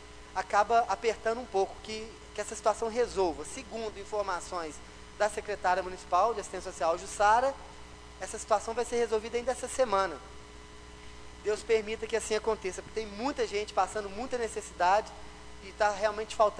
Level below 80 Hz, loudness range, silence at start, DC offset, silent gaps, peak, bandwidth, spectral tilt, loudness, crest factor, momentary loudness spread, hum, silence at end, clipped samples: -54 dBFS; 3 LU; 0 s; under 0.1%; none; -12 dBFS; 11 kHz; -3 dB/octave; -31 LUFS; 20 dB; 20 LU; none; 0 s; under 0.1%